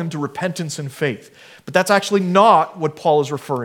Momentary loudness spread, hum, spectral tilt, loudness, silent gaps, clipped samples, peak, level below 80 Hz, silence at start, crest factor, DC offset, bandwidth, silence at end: 12 LU; none; -5 dB/octave; -18 LUFS; none; under 0.1%; 0 dBFS; -68 dBFS; 0 s; 18 dB; under 0.1%; 18 kHz; 0 s